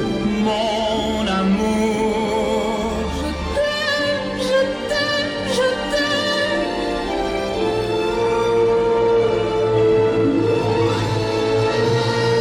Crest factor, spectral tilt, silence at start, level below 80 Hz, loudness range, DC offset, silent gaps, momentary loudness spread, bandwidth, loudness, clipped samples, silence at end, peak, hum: 12 dB; -5.5 dB/octave; 0 s; -38 dBFS; 3 LU; under 0.1%; none; 5 LU; 15.5 kHz; -19 LUFS; under 0.1%; 0 s; -6 dBFS; none